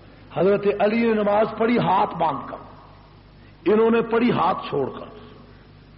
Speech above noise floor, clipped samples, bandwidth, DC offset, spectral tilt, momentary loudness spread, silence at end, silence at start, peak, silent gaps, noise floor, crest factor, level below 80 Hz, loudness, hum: 27 dB; under 0.1%; 5.6 kHz; under 0.1%; -5 dB/octave; 14 LU; 0.55 s; 0.3 s; -10 dBFS; none; -47 dBFS; 12 dB; -54 dBFS; -21 LUFS; 50 Hz at -50 dBFS